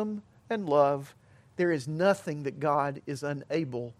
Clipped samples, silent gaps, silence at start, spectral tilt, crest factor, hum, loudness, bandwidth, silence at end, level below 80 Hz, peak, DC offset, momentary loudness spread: under 0.1%; none; 0 s; -6.5 dB/octave; 20 dB; none; -29 LUFS; 13.5 kHz; 0.1 s; -72 dBFS; -10 dBFS; under 0.1%; 11 LU